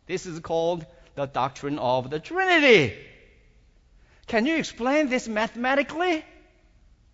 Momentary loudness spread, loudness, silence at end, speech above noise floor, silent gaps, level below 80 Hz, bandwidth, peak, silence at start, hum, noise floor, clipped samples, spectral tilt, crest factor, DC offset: 14 LU; -24 LUFS; 0.9 s; 33 dB; none; -56 dBFS; 8 kHz; -4 dBFS; 0.1 s; none; -57 dBFS; under 0.1%; -4.5 dB/octave; 22 dB; under 0.1%